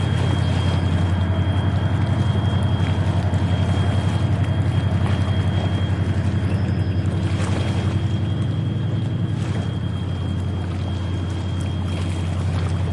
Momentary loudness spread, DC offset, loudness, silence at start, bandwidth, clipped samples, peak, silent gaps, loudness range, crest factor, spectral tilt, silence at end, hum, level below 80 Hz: 5 LU; 0.2%; -22 LUFS; 0 s; 11 kHz; under 0.1%; -8 dBFS; none; 4 LU; 12 dB; -7.5 dB/octave; 0 s; none; -42 dBFS